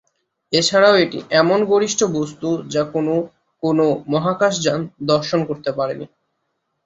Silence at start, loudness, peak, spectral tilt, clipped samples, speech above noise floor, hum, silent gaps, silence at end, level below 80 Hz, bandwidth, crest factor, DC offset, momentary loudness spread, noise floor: 0.5 s; -18 LUFS; -2 dBFS; -4.5 dB/octave; under 0.1%; 55 dB; none; none; 0.8 s; -58 dBFS; 8.4 kHz; 16 dB; under 0.1%; 10 LU; -73 dBFS